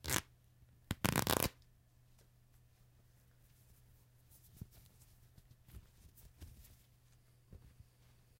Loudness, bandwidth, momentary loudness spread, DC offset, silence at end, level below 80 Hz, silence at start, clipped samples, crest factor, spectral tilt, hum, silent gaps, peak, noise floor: -37 LUFS; 17 kHz; 29 LU; under 0.1%; 0.7 s; -60 dBFS; 0.05 s; under 0.1%; 38 dB; -3.5 dB/octave; none; none; -8 dBFS; -68 dBFS